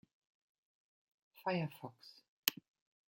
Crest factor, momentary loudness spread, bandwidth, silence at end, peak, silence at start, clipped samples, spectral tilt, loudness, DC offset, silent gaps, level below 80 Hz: 38 dB; 22 LU; 16.5 kHz; 0.55 s; -8 dBFS; 1.4 s; under 0.1%; -3.5 dB/octave; -40 LUFS; under 0.1%; 2.28-2.43 s; -88 dBFS